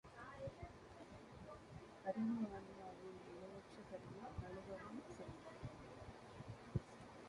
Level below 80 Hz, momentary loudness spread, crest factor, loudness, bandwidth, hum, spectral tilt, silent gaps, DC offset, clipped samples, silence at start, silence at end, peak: -66 dBFS; 13 LU; 24 dB; -52 LUFS; 11 kHz; none; -7 dB/octave; none; under 0.1%; under 0.1%; 0.05 s; 0 s; -28 dBFS